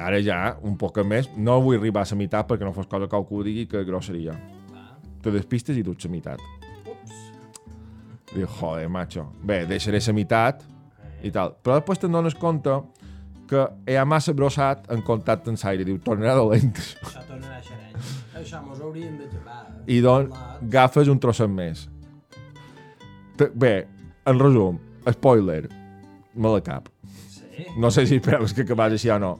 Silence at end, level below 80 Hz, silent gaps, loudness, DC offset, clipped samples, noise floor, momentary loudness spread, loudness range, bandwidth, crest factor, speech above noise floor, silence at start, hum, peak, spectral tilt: 0 s; -48 dBFS; none; -22 LUFS; under 0.1%; under 0.1%; -46 dBFS; 20 LU; 9 LU; 13 kHz; 20 dB; 25 dB; 0 s; none; -4 dBFS; -7 dB/octave